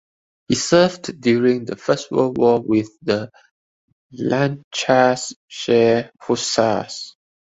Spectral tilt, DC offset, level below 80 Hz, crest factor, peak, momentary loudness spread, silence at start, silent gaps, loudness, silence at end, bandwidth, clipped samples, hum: -4.5 dB/octave; under 0.1%; -56 dBFS; 18 dB; 0 dBFS; 11 LU; 0.5 s; 3.51-4.10 s, 4.64-4.71 s, 5.36-5.48 s; -19 LUFS; 0.45 s; 8.2 kHz; under 0.1%; none